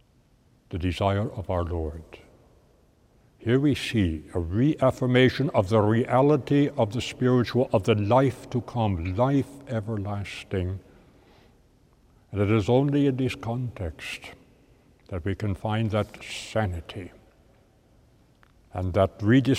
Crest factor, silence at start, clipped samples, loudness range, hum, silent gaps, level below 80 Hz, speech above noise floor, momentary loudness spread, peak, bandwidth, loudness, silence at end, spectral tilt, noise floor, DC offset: 20 dB; 0.7 s; under 0.1%; 9 LU; none; none; -48 dBFS; 37 dB; 14 LU; -6 dBFS; 14 kHz; -25 LUFS; 0 s; -7.5 dB/octave; -61 dBFS; under 0.1%